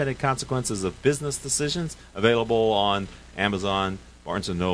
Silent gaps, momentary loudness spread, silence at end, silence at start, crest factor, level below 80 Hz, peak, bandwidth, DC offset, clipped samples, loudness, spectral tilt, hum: none; 9 LU; 0 s; 0 s; 20 dB; -48 dBFS; -6 dBFS; 11 kHz; under 0.1%; under 0.1%; -25 LUFS; -4 dB/octave; none